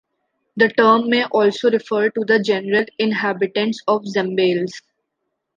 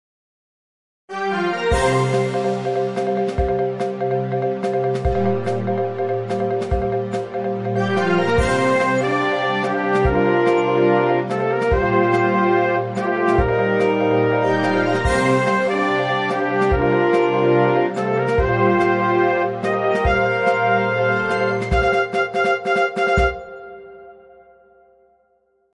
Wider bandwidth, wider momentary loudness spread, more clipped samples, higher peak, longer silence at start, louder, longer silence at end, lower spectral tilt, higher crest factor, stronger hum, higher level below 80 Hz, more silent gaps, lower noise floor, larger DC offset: second, 7.4 kHz vs 11.5 kHz; about the same, 6 LU vs 6 LU; neither; about the same, -2 dBFS vs -4 dBFS; second, 0.55 s vs 1.1 s; about the same, -18 LUFS vs -19 LUFS; second, 0.8 s vs 1.6 s; about the same, -5.5 dB/octave vs -6.5 dB/octave; about the same, 18 dB vs 14 dB; neither; second, -68 dBFS vs -34 dBFS; neither; first, -76 dBFS vs -63 dBFS; neither